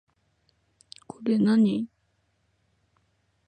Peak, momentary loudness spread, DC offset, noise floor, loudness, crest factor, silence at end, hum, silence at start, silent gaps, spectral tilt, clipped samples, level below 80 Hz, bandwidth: -14 dBFS; 18 LU; under 0.1%; -71 dBFS; -24 LUFS; 16 dB; 1.6 s; none; 1.2 s; none; -7.5 dB/octave; under 0.1%; -72 dBFS; 9.2 kHz